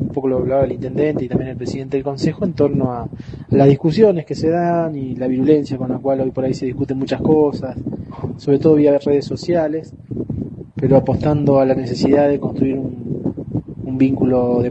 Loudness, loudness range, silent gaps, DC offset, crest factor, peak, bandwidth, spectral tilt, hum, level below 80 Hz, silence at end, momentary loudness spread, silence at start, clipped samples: -17 LUFS; 2 LU; none; under 0.1%; 16 dB; 0 dBFS; 8.2 kHz; -8.5 dB/octave; none; -42 dBFS; 0 s; 12 LU; 0 s; under 0.1%